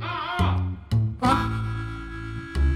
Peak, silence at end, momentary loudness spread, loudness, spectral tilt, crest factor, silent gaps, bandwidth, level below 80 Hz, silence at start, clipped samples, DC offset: -6 dBFS; 0 s; 12 LU; -26 LUFS; -7 dB/octave; 18 dB; none; 12 kHz; -32 dBFS; 0 s; under 0.1%; under 0.1%